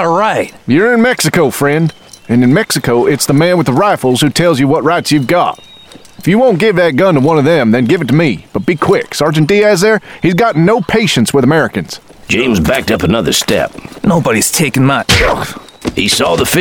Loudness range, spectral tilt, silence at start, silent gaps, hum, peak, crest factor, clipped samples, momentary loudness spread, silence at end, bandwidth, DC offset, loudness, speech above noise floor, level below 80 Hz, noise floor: 1 LU; -5 dB/octave; 0 s; none; none; 0 dBFS; 10 dB; under 0.1%; 7 LU; 0 s; over 20 kHz; 0.4%; -11 LUFS; 26 dB; -34 dBFS; -36 dBFS